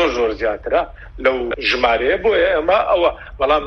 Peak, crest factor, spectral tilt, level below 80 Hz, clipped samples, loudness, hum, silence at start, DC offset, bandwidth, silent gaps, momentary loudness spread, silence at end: 0 dBFS; 18 dB; -4.5 dB/octave; -38 dBFS; under 0.1%; -17 LUFS; none; 0 s; under 0.1%; 6.6 kHz; none; 5 LU; 0 s